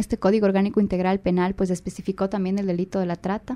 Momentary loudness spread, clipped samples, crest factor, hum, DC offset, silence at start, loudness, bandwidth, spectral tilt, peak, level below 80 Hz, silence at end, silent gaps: 7 LU; under 0.1%; 14 dB; none; under 0.1%; 0 s; -23 LUFS; 11.5 kHz; -7.5 dB/octave; -8 dBFS; -46 dBFS; 0 s; none